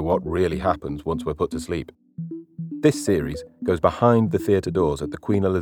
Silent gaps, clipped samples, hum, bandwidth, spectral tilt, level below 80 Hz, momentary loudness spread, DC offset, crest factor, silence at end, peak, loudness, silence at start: none; under 0.1%; none; 19.5 kHz; -7 dB/octave; -44 dBFS; 16 LU; under 0.1%; 20 dB; 0 s; -2 dBFS; -23 LUFS; 0 s